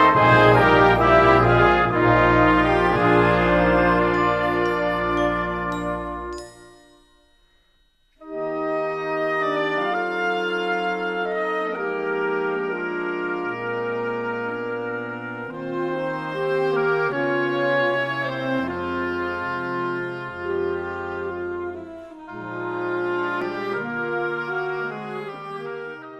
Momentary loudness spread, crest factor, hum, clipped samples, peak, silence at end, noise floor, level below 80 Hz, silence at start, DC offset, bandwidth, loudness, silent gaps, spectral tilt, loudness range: 15 LU; 20 dB; none; under 0.1%; -2 dBFS; 0 s; -61 dBFS; -42 dBFS; 0 s; under 0.1%; 12 kHz; -22 LUFS; none; -7 dB/octave; 11 LU